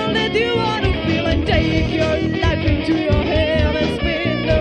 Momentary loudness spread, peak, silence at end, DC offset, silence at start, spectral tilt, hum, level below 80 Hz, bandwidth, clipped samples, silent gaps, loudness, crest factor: 2 LU; -4 dBFS; 0 s; under 0.1%; 0 s; -6.5 dB/octave; none; -26 dBFS; 9.4 kHz; under 0.1%; none; -18 LUFS; 14 dB